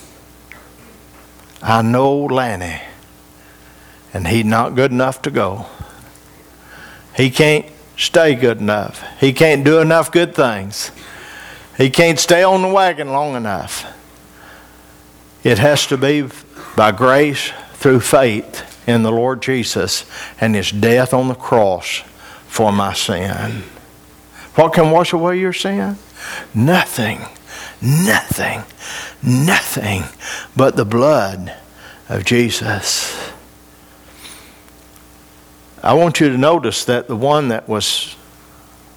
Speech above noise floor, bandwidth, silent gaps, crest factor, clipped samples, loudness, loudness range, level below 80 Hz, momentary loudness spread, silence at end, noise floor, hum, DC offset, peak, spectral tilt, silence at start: 29 dB; over 20 kHz; none; 16 dB; under 0.1%; -15 LUFS; 5 LU; -48 dBFS; 17 LU; 0.8 s; -44 dBFS; none; under 0.1%; 0 dBFS; -4.5 dB/octave; 0.55 s